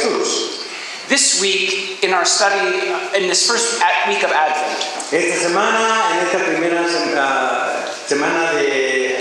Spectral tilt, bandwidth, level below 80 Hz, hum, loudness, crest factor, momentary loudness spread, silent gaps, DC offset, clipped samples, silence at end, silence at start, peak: -1 dB/octave; 12.5 kHz; -74 dBFS; none; -16 LUFS; 16 dB; 7 LU; none; under 0.1%; under 0.1%; 0 s; 0 s; 0 dBFS